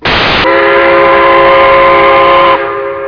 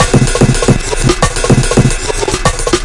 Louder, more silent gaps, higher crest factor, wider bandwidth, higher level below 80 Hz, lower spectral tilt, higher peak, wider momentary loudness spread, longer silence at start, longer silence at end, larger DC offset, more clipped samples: first, -5 LUFS vs -11 LUFS; neither; about the same, 6 dB vs 10 dB; second, 5.4 kHz vs 11.5 kHz; second, -30 dBFS vs -18 dBFS; about the same, -5.5 dB/octave vs -4.5 dB/octave; about the same, 0 dBFS vs 0 dBFS; about the same, 3 LU vs 4 LU; about the same, 0 s vs 0 s; about the same, 0 s vs 0 s; neither; first, 7% vs 0.5%